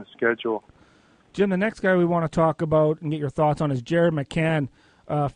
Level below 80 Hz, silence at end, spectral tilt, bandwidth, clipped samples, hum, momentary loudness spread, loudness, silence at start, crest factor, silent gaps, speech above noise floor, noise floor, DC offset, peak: -52 dBFS; 0.05 s; -7.5 dB/octave; 10 kHz; under 0.1%; none; 8 LU; -23 LUFS; 0 s; 16 dB; none; 35 dB; -57 dBFS; under 0.1%; -8 dBFS